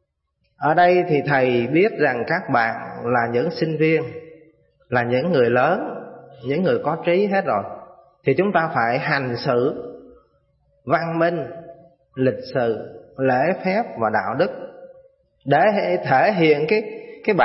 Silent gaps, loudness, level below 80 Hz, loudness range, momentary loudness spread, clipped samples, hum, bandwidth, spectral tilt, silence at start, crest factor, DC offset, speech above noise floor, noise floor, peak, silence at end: none; -20 LUFS; -62 dBFS; 4 LU; 17 LU; under 0.1%; none; 5.8 kHz; -11 dB/octave; 0.6 s; 18 dB; under 0.1%; 51 dB; -70 dBFS; -2 dBFS; 0 s